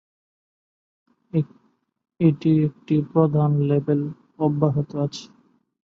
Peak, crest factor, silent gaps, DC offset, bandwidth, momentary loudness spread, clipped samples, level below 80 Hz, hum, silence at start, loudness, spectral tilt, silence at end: -4 dBFS; 18 dB; none; under 0.1%; 7 kHz; 9 LU; under 0.1%; -62 dBFS; none; 1.35 s; -22 LUFS; -9 dB/octave; 0.6 s